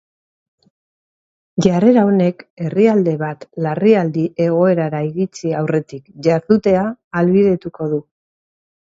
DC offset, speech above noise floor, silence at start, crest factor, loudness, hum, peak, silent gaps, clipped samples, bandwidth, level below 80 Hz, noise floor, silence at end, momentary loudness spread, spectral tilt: under 0.1%; over 75 dB; 1.55 s; 16 dB; -16 LUFS; none; 0 dBFS; 2.50-2.57 s, 7.04-7.11 s; under 0.1%; 7.8 kHz; -54 dBFS; under -90 dBFS; 0.8 s; 10 LU; -8 dB/octave